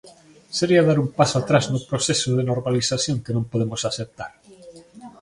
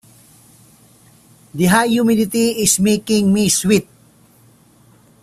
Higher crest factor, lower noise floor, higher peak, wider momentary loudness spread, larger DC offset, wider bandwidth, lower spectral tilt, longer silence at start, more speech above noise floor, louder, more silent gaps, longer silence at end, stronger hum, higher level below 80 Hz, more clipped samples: about the same, 22 dB vs 18 dB; second, -46 dBFS vs -50 dBFS; about the same, 0 dBFS vs 0 dBFS; first, 12 LU vs 4 LU; neither; second, 11.5 kHz vs 16 kHz; about the same, -5 dB/octave vs -4 dB/octave; second, 0.05 s vs 1.55 s; second, 25 dB vs 36 dB; second, -21 LUFS vs -15 LUFS; neither; second, 0.1 s vs 1.4 s; neither; about the same, -54 dBFS vs -50 dBFS; neither